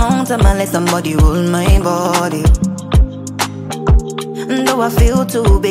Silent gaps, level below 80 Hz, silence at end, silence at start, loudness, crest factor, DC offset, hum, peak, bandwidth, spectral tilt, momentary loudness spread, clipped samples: none; -16 dBFS; 0 s; 0 s; -14 LUFS; 12 dB; under 0.1%; none; 0 dBFS; 16 kHz; -6 dB/octave; 7 LU; under 0.1%